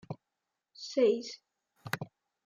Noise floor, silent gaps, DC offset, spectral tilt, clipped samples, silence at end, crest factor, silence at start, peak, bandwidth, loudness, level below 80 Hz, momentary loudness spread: -87 dBFS; none; under 0.1%; -5 dB/octave; under 0.1%; 0.4 s; 20 dB; 0.1 s; -16 dBFS; 16 kHz; -32 LUFS; -80 dBFS; 21 LU